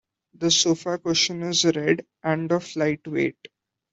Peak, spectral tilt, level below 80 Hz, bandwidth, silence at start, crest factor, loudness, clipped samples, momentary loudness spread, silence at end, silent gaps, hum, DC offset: -6 dBFS; -3.5 dB/octave; -64 dBFS; 8.2 kHz; 0.4 s; 20 dB; -23 LUFS; under 0.1%; 7 LU; 0.6 s; none; none; under 0.1%